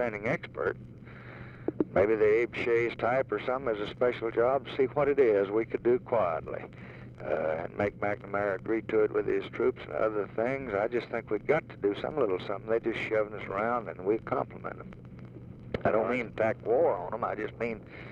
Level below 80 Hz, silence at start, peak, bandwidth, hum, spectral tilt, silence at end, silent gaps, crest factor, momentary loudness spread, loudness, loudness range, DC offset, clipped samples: -58 dBFS; 0 s; -12 dBFS; 7 kHz; none; -8 dB/octave; 0 s; none; 18 dB; 15 LU; -30 LUFS; 4 LU; under 0.1%; under 0.1%